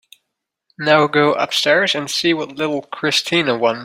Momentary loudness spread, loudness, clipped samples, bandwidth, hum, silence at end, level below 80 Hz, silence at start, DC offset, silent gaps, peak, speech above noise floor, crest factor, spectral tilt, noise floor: 8 LU; -16 LUFS; under 0.1%; 16.5 kHz; none; 0 s; -62 dBFS; 0.8 s; under 0.1%; none; 0 dBFS; 61 dB; 18 dB; -3.5 dB/octave; -78 dBFS